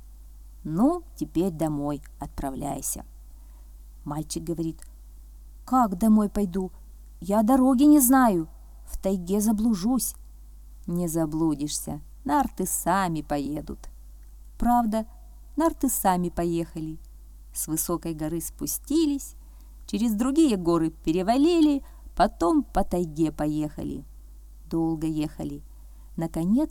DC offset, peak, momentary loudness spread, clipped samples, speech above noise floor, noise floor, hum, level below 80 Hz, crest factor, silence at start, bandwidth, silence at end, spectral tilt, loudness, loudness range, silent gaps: under 0.1%; -6 dBFS; 15 LU; under 0.1%; 21 dB; -45 dBFS; 50 Hz at -45 dBFS; -42 dBFS; 20 dB; 0 s; 19 kHz; 0 s; -5.5 dB/octave; -25 LUFS; 9 LU; none